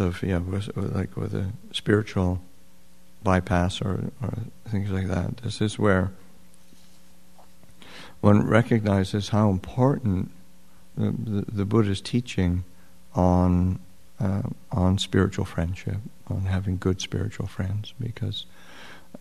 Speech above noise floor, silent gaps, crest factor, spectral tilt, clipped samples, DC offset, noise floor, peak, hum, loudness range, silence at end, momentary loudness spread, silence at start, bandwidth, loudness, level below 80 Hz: 33 dB; none; 24 dB; -7 dB/octave; under 0.1%; 0.7%; -57 dBFS; -2 dBFS; none; 5 LU; 0.2 s; 13 LU; 0 s; 13 kHz; -26 LUFS; -46 dBFS